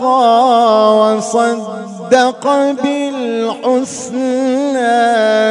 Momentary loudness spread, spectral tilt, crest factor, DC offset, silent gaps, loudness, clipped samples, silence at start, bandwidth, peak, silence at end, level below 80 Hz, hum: 8 LU; -4 dB/octave; 12 dB; under 0.1%; none; -13 LUFS; under 0.1%; 0 s; 11 kHz; 0 dBFS; 0 s; -66 dBFS; none